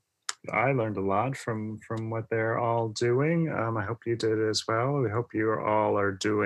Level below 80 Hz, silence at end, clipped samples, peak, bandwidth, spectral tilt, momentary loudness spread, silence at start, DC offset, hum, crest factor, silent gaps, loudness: -70 dBFS; 0 s; under 0.1%; -10 dBFS; 12 kHz; -5.5 dB/octave; 8 LU; 0.3 s; under 0.1%; none; 18 dB; none; -28 LUFS